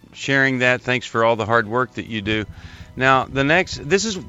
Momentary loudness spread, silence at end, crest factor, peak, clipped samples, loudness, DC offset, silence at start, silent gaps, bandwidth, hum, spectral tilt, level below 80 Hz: 8 LU; 0 s; 20 dB; 0 dBFS; under 0.1%; -19 LUFS; under 0.1%; 0.15 s; none; 8 kHz; none; -4.5 dB/octave; -46 dBFS